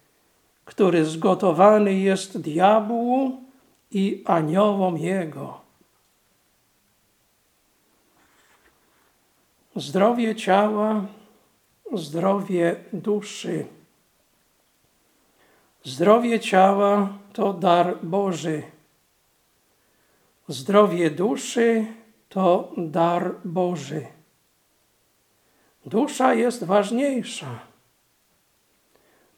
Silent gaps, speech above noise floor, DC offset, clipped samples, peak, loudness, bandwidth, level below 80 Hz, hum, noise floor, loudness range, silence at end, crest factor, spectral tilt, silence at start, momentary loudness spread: none; 44 dB; under 0.1%; under 0.1%; -2 dBFS; -22 LUFS; 16 kHz; -76 dBFS; none; -65 dBFS; 8 LU; 1.75 s; 22 dB; -6 dB/octave; 0.65 s; 15 LU